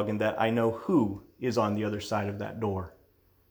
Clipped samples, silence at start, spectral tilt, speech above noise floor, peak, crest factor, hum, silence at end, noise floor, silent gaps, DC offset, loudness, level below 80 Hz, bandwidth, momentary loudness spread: under 0.1%; 0 s; -7 dB/octave; 36 dB; -12 dBFS; 18 dB; none; 0.6 s; -64 dBFS; none; under 0.1%; -29 LUFS; -62 dBFS; over 20 kHz; 8 LU